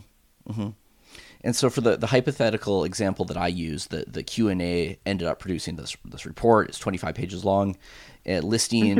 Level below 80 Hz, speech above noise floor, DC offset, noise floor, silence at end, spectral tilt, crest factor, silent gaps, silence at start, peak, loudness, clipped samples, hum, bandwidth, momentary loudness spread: -50 dBFS; 26 dB; under 0.1%; -51 dBFS; 0 s; -5 dB/octave; 20 dB; none; 0.45 s; -6 dBFS; -25 LUFS; under 0.1%; none; 16.5 kHz; 12 LU